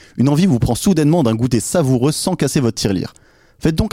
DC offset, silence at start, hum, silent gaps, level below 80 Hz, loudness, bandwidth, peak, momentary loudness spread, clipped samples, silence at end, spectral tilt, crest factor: under 0.1%; 0.15 s; none; none; -34 dBFS; -16 LUFS; 16.5 kHz; -4 dBFS; 6 LU; under 0.1%; 0.05 s; -6 dB/octave; 12 dB